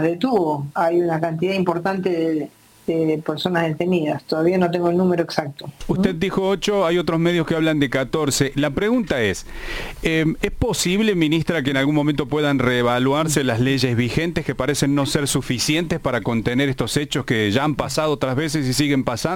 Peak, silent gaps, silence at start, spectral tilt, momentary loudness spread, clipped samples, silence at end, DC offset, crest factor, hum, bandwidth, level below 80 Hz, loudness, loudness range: -4 dBFS; none; 0 s; -5 dB/octave; 5 LU; under 0.1%; 0 s; under 0.1%; 16 dB; none; 17 kHz; -40 dBFS; -20 LUFS; 2 LU